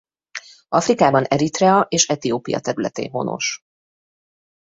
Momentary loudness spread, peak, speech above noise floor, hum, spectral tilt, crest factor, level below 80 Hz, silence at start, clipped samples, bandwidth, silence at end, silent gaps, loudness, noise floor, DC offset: 19 LU; 0 dBFS; 20 dB; none; -4 dB/octave; 20 dB; -58 dBFS; 0.35 s; under 0.1%; 8.2 kHz; 1.2 s; none; -19 LUFS; -38 dBFS; under 0.1%